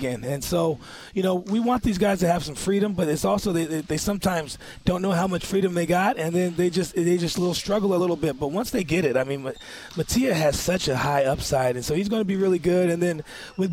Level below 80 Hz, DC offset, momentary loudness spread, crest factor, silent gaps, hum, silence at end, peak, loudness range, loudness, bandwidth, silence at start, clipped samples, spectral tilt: -44 dBFS; under 0.1%; 7 LU; 16 dB; none; none; 0 s; -8 dBFS; 1 LU; -24 LUFS; 16.5 kHz; 0 s; under 0.1%; -5.5 dB/octave